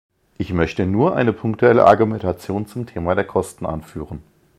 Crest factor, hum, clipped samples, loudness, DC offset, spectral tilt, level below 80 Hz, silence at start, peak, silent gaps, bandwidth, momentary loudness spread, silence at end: 18 dB; none; under 0.1%; -18 LUFS; under 0.1%; -7.5 dB/octave; -42 dBFS; 0.4 s; 0 dBFS; none; 14 kHz; 18 LU; 0.35 s